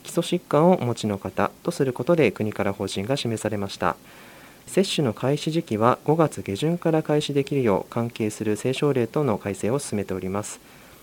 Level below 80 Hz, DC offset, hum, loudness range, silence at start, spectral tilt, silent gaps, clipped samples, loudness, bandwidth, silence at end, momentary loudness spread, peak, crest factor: -60 dBFS; under 0.1%; none; 3 LU; 0.05 s; -6 dB/octave; none; under 0.1%; -24 LUFS; 17.5 kHz; 0.45 s; 8 LU; -2 dBFS; 22 dB